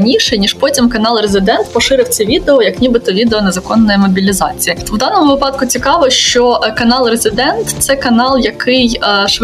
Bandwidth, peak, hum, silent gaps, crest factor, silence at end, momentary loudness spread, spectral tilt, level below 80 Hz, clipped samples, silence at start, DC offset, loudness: 15.5 kHz; 0 dBFS; none; none; 10 dB; 0 s; 4 LU; -3.5 dB/octave; -32 dBFS; under 0.1%; 0 s; under 0.1%; -10 LUFS